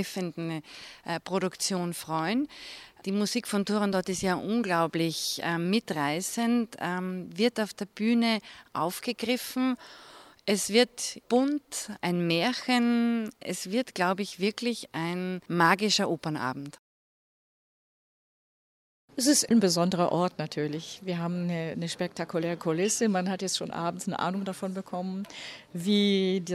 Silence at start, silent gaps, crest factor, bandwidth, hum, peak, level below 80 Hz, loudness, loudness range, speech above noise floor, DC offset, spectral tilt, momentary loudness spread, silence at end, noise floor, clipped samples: 0 s; 16.79-19.08 s; 22 dB; 15.5 kHz; none; -8 dBFS; -70 dBFS; -29 LUFS; 3 LU; over 61 dB; under 0.1%; -4 dB/octave; 11 LU; 0 s; under -90 dBFS; under 0.1%